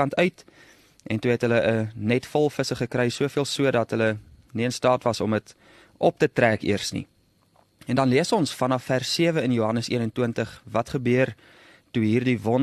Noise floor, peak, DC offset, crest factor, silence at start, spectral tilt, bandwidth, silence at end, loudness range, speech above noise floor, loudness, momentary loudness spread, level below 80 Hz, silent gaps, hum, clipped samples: -62 dBFS; -4 dBFS; under 0.1%; 20 dB; 0 s; -5.5 dB/octave; 13 kHz; 0 s; 1 LU; 38 dB; -24 LUFS; 7 LU; -58 dBFS; none; none; under 0.1%